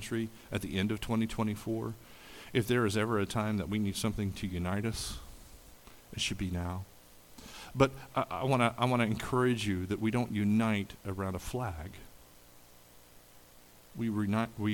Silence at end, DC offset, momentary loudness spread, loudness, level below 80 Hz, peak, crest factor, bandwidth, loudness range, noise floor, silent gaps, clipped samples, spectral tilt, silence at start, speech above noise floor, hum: 0 s; under 0.1%; 18 LU; -33 LUFS; -52 dBFS; -10 dBFS; 24 dB; 19 kHz; 8 LU; -57 dBFS; none; under 0.1%; -5.5 dB/octave; 0 s; 25 dB; none